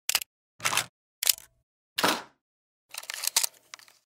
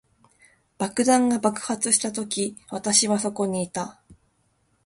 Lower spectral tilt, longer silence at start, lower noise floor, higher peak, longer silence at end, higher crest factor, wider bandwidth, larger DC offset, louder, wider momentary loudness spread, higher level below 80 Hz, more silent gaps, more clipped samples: second, 0 dB/octave vs -3 dB/octave; second, 0.1 s vs 0.8 s; second, -52 dBFS vs -67 dBFS; about the same, -2 dBFS vs -4 dBFS; second, 0.6 s vs 0.75 s; first, 32 dB vs 22 dB; first, 16.5 kHz vs 11.5 kHz; neither; second, -28 LUFS vs -23 LUFS; first, 17 LU vs 11 LU; second, -74 dBFS vs -64 dBFS; first, 0.26-0.59 s, 0.89-1.22 s, 1.63-1.96 s, 2.41-2.89 s vs none; neither